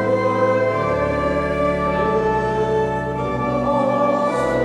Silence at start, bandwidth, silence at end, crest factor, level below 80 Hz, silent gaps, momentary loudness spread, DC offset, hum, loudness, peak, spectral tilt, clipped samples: 0 s; 11.5 kHz; 0 s; 12 dB; -38 dBFS; none; 3 LU; under 0.1%; none; -19 LUFS; -6 dBFS; -7 dB/octave; under 0.1%